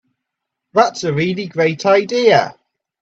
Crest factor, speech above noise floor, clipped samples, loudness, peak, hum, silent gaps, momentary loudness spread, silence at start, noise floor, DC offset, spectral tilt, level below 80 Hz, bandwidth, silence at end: 16 dB; 64 dB; under 0.1%; -15 LUFS; 0 dBFS; none; none; 7 LU; 0.75 s; -79 dBFS; under 0.1%; -5 dB/octave; -60 dBFS; 8 kHz; 0.5 s